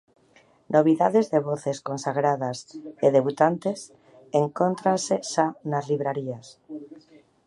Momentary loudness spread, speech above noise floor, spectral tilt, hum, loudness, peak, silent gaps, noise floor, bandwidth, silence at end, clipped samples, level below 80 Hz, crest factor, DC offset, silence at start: 19 LU; 35 dB; -6 dB/octave; none; -24 LUFS; -4 dBFS; none; -59 dBFS; 11.5 kHz; 0.5 s; under 0.1%; -74 dBFS; 20 dB; under 0.1%; 0.7 s